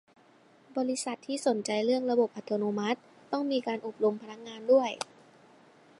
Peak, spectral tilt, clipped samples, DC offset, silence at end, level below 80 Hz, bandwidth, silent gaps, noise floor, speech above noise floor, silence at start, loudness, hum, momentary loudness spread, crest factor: -10 dBFS; -4.5 dB/octave; under 0.1%; under 0.1%; 0.95 s; -86 dBFS; 11.5 kHz; none; -60 dBFS; 31 dB; 0.7 s; -30 LUFS; none; 13 LU; 20 dB